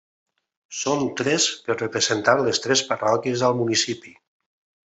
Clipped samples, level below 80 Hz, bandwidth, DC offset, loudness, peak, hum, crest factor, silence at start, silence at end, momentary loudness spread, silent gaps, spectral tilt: under 0.1%; -66 dBFS; 8.4 kHz; under 0.1%; -21 LUFS; -2 dBFS; none; 22 dB; 0.7 s; 0.8 s; 7 LU; none; -3 dB/octave